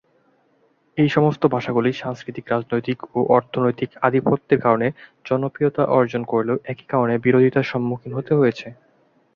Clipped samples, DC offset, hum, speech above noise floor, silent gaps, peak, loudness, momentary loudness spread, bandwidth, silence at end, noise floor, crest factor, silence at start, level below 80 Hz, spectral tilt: under 0.1%; under 0.1%; none; 42 dB; none; -2 dBFS; -20 LUFS; 9 LU; 7 kHz; 0.65 s; -62 dBFS; 18 dB; 0.95 s; -60 dBFS; -8.5 dB/octave